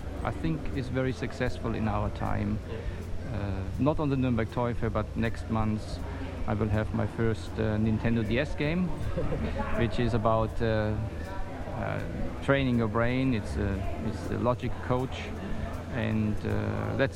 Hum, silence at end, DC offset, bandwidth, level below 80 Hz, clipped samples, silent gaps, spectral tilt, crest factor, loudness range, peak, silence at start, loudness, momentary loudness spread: none; 0 s; under 0.1%; 12.5 kHz; -38 dBFS; under 0.1%; none; -7.5 dB/octave; 20 dB; 2 LU; -10 dBFS; 0 s; -30 LUFS; 9 LU